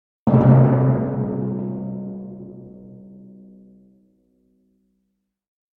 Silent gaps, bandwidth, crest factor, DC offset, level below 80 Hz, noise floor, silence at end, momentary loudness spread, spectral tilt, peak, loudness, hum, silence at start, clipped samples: none; 2.9 kHz; 20 dB; under 0.1%; -50 dBFS; -74 dBFS; 2.8 s; 26 LU; -13 dB/octave; -2 dBFS; -18 LUFS; none; 0.25 s; under 0.1%